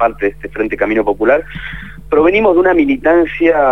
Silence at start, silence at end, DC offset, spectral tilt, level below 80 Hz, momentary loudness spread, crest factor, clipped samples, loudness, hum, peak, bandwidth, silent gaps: 0 s; 0 s; 1%; -7.5 dB/octave; -36 dBFS; 14 LU; 12 dB; under 0.1%; -13 LUFS; none; 0 dBFS; 5.8 kHz; none